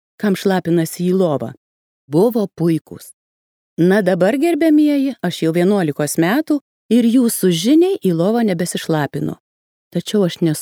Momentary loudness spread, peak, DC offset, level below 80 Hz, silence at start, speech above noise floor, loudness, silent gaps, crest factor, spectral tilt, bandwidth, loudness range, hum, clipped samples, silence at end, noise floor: 10 LU; -2 dBFS; under 0.1%; -64 dBFS; 0.2 s; over 75 dB; -16 LUFS; 1.57-2.08 s, 2.81-2.85 s, 3.14-3.77 s, 6.61-6.89 s, 9.40-9.91 s; 14 dB; -6 dB/octave; 19 kHz; 3 LU; none; under 0.1%; 0 s; under -90 dBFS